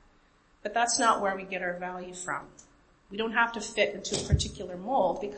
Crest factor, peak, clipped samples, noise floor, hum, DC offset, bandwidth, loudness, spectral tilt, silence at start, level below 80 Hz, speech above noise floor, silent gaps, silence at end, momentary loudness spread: 20 dB; -10 dBFS; under 0.1%; -63 dBFS; none; under 0.1%; 8.8 kHz; -29 LUFS; -3.5 dB/octave; 0.65 s; -46 dBFS; 34 dB; none; 0 s; 13 LU